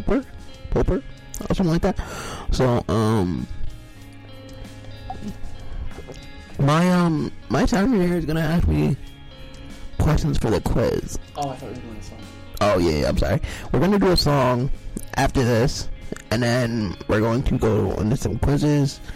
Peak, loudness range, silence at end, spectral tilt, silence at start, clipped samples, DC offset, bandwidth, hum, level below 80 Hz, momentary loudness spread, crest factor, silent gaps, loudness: -10 dBFS; 5 LU; 0 s; -6.5 dB/octave; 0 s; under 0.1%; under 0.1%; 16 kHz; none; -30 dBFS; 20 LU; 12 dB; none; -22 LUFS